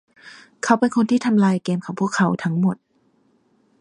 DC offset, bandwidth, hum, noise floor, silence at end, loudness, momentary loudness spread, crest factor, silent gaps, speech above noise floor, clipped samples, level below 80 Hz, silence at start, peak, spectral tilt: under 0.1%; 10.5 kHz; none; -62 dBFS; 1.05 s; -20 LUFS; 7 LU; 20 dB; none; 43 dB; under 0.1%; -66 dBFS; 0.25 s; -2 dBFS; -6.5 dB/octave